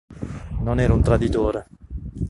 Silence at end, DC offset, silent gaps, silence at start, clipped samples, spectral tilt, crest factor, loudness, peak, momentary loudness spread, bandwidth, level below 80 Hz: 0 s; under 0.1%; none; 0.1 s; under 0.1%; -8.5 dB/octave; 18 dB; -21 LUFS; -4 dBFS; 17 LU; 11.5 kHz; -28 dBFS